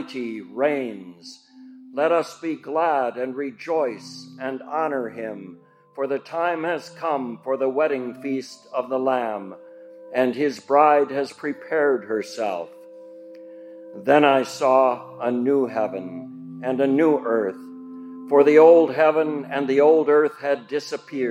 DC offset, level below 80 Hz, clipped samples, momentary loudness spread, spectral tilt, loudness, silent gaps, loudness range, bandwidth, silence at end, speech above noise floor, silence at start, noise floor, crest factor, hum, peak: under 0.1%; -84 dBFS; under 0.1%; 21 LU; -5.5 dB/octave; -21 LUFS; none; 9 LU; 12 kHz; 0 s; 23 dB; 0 s; -45 dBFS; 20 dB; none; -2 dBFS